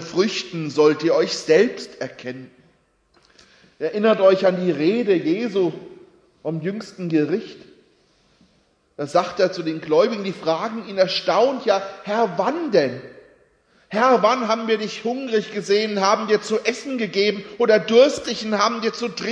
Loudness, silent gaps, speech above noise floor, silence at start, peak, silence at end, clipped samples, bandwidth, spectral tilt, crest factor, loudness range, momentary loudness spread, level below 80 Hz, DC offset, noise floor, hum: -20 LUFS; none; 42 dB; 0 s; -2 dBFS; 0 s; under 0.1%; 10.5 kHz; -5 dB/octave; 18 dB; 6 LU; 12 LU; -66 dBFS; under 0.1%; -62 dBFS; none